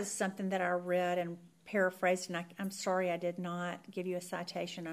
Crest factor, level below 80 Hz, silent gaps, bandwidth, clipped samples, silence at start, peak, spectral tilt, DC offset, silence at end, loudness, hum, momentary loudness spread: 16 dB; -86 dBFS; none; 15.5 kHz; under 0.1%; 0 s; -20 dBFS; -4.5 dB/octave; under 0.1%; 0 s; -36 LUFS; none; 8 LU